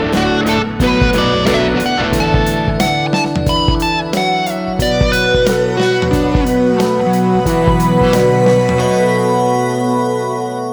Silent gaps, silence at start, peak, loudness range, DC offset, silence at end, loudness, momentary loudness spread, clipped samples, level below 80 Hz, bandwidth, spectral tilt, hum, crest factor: none; 0 s; -2 dBFS; 2 LU; under 0.1%; 0 s; -14 LUFS; 4 LU; under 0.1%; -26 dBFS; over 20 kHz; -5.5 dB/octave; none; 12 dB